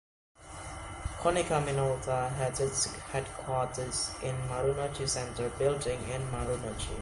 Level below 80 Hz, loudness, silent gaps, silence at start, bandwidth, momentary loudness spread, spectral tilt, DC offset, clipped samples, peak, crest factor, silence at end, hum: -46 dBFS; -32 LUFS; none; 0.4 s; 11.5 kHz; 9 LU; -4 dB/octave; under 0.1%; under 0.1%; -14 dBFS; 20 dB; 0 s; none